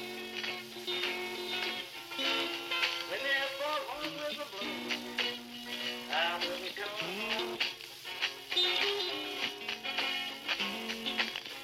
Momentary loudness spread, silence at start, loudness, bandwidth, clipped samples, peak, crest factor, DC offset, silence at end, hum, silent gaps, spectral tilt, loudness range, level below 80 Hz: 7 LU; 0 s; -34 LUFS; 17 kHz; under 0.1%; -16 dBFS; 20 dB; under 0.1%; 0 s; none; none; -1.5 dB/octave; 2 LU; -74 dBFS